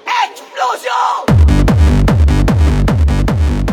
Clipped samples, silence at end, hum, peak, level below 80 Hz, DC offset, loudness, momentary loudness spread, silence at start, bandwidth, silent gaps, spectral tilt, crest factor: under 0.1%; 0 s; none; -2 dBFS; -14 dBFS; under 0.1%; -12 LUFS; 6 LU; 0.05 s; 13.5 kHz; none; -7 dB/octave; 10 dB